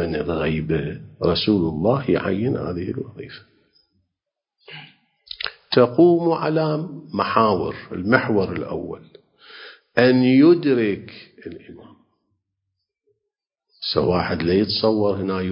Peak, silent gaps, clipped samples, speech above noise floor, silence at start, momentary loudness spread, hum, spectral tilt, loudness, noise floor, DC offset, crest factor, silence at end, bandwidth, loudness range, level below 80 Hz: 0 dBFS; none; under 0.1%; 64 dB; 0 s; 24 LU; none; -9.5 dB/octave; -20 LUFS; -83 dBFS; under 0.1%; 22 dB; 0 s; 5.6 kHz; 9 LU; -46 dBFS